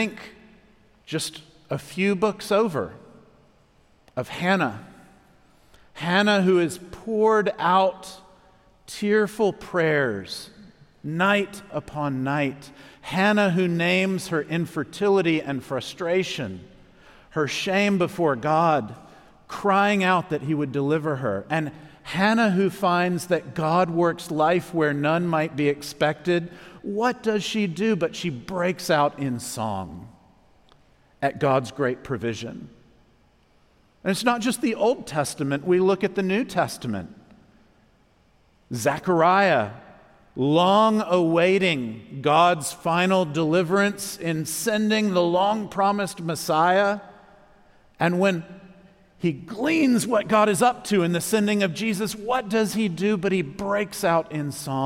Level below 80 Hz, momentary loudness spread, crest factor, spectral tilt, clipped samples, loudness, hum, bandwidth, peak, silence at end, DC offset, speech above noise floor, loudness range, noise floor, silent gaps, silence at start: -60 dBFS; 13 LU; 18 dB; -5 dB/octave; under 0.1%; -23 LUFS; none; 16.5 kHz; -6 dBFS; 0 s; under 0.1%; 37 dB; 6 LU; -60 dBFS; none; 0 s